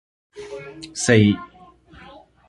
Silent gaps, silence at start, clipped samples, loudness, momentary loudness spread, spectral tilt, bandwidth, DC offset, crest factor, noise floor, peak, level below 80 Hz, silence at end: none; 0.35 s; under 0.1%; -18 LUFS; 21 LU; -5 dB/octave; 11.5 kHz; under 0.1%; 22 dB; -48 dBFS; -2 dBFS; -50 dBFS; 1.05 s